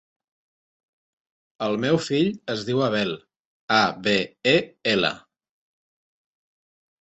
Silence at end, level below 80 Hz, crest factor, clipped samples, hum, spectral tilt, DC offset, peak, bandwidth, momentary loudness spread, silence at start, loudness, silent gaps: 1.85 s; -64 dBFS; 20 dB; under 0.1%; none; -5 dB/octave; under 0.1%; -6 dBFS; 8.2 kHz; 9 LU; 1.6 s; -23 LUFS; 3.40-3.68 s